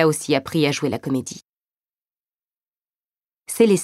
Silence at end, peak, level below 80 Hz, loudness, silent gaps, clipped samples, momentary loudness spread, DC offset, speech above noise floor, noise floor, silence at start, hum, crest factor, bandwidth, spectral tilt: 0 s; -2 dBFS; -64 dBFS; -21 LUFS; 1.49-1.53 s, 2.35-2.39 s, 2.67-2.73 s; under 0.1%; 15 LU; under 0.1%; over 71 dB; under -90 dBFS; 0 s; none; 20 dB; 16 kHz; -5 dB/octave